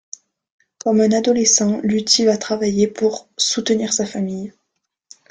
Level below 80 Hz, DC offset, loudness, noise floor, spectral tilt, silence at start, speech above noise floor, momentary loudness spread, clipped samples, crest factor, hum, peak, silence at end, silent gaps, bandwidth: -58 dBFS; under 0.1%; -17 LUFS; -75 dBFS; -3.5 dB/octave; 0.85 s; 58 dB; 12 LU; under 0.1%; 18 dB; none; 0 dBFS; 0.8 s; none; 10 kHz